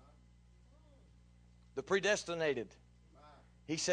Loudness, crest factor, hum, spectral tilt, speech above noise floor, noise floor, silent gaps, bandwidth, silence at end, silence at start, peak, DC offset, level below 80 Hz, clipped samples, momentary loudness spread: -36 LUFS; 20 dB; 60 Hz at -65 dBFS; -3 dB/octave; 28 dB; -63 dBFS; none; 10.5 kHz; 0 s; 1.75 s; -20 dBFS; under 0.1%; -66 dBFS; under 0.1%; 17 LU